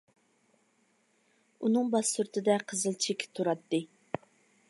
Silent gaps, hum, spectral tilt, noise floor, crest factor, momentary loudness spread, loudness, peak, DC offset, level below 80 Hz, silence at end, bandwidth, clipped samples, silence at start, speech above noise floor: none; none; -3.5 dB/octave; -71 dBFS; 20 dB; 13 LU; -31 LUFS; -14 dBFS; under 0.1%; -82 dBFS; 0.85 s; 11.5 kHz; under 0.1%; 1.6 s; 41 dB